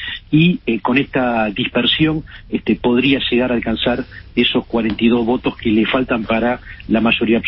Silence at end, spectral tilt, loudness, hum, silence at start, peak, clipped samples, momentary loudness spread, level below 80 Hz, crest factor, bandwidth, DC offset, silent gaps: 0 s; -11 dB/octave; -17 LUFS; none; 0 s; -2 dBFS; under 0.1%; 6 LU; -40 dBFS; 14 dB; 5.6 kHz; under 0.1%; none